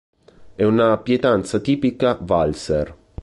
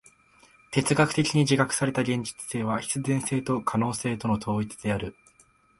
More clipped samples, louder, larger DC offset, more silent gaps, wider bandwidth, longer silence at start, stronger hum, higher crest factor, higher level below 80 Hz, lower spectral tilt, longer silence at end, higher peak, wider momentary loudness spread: neither; first, -19 LUFS vs -26 LUFS; neither; neither; about the same, 11.5 kHz vs 11.5 kHz; second, 0.4 s vs 0.7 s; neither; about the same, 16 dB vs 20 dB; first, -42 dBFS vs -54 dBFS; first, -6.5 dB/octave vs -5 dB/octave; second, 0 s vs 0.65 s; about the same, -4 dBFS vs -6 dBFS; about the same, 6 LU vs 8 LU